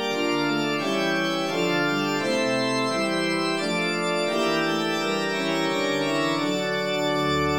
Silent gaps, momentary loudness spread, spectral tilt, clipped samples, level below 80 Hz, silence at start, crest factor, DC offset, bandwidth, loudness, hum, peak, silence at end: none; 2 LU; -4 dB/octave; under 0.1%; -56 dBFS; 0 s; 12 dB; 0.2%; 17 kHz; -24 LUFS; none; -12 dBFS; 0 s